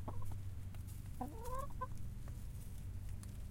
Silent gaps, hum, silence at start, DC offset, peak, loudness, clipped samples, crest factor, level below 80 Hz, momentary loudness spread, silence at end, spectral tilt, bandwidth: none; none; 0 s; under 0.1%; -30 dBFS; -49 LUFS; under 0.1%; 14 dB; -50 dBFS; 4 LU; 0 s; -6.5 dB/octave; 16.5 kHz